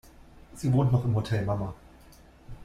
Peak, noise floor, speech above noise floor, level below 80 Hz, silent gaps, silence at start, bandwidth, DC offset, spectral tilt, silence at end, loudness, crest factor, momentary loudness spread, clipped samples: -12 dBFS; -53 dBFS; 27 dB; -50 dBFS; none; 0.35 s; 12.5 kHz; under 0.1%; -8 dB/octave; 0 s; -28 LUFS; 16 dB; 12 LU; under 0.1%